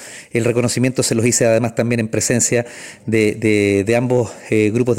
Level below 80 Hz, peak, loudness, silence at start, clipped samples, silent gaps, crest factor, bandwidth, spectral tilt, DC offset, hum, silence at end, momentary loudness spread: -52 dBFS; -2 dBFS; -16 LUFS; 0 s; under 0.1%; none; 14 dB; 16.5 kHz; -5 dB/octave; under 0.1%; none; 0 s; 6 LU